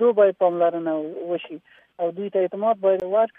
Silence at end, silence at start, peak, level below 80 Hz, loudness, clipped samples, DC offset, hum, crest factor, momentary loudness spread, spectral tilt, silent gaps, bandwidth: 0.1 s; 0 s; -6 dBFS; -74 dBFS; -22 LUFS; under 0.1%; under 0.1%; none; 16 dB; 11 LU; -8.5 dB/octave; none; 3.8 kHz